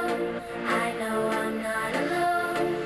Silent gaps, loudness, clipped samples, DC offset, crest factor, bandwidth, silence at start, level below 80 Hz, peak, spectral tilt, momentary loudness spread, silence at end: none; -27 LUFS; under 0.1%; under 0.1%; 14 dB; 14 kHz; 0 s; -58 dBFS; -14 dBFS; -4.5 dB/octave; 4 LU; 0 s